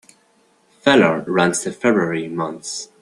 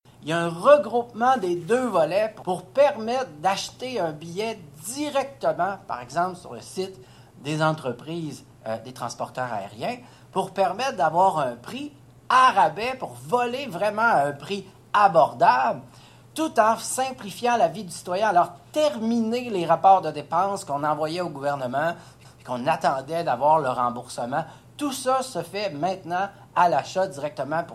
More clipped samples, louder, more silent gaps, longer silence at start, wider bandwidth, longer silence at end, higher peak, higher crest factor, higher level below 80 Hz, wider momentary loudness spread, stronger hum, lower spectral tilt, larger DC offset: neither; first, -18 LUFS vs -24 LUFS; neither; first, 0.85 s vs 0.2 s; second, 12.5 kHz vs 15 kHz; first, 0.15 s vs 0 s; first, 0 dBFS vs -4 dBFS; about the same, 18 dB vs 20 dB; about the same, -60 dBFS vs -64 dBFS; second, 11 LU vs 14 LU; neither; about the same, -4.5 dB/octave vs -4.5 dB/octave; neither